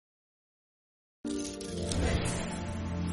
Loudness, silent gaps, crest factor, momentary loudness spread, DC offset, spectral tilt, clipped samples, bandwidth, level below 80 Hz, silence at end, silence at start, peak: -34 LUFS; none; 20 dB; 7 LU; under 0.1%; -5 dB/octave; under 0.1%; 11.5 kHz; -44 dBFS; 0 s; 1.25 s; -14 dBFS